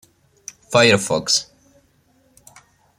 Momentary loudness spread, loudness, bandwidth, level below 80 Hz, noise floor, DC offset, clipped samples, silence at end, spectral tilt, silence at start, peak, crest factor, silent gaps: 25 LU; -16 LUFS; 16 kHz; -60 dBFS; -59 dBFS; under 0.1%; under 0.1%; 1.55 s; -3 dB/octave; 0.7 s; 0 dBFS; 22 dB; none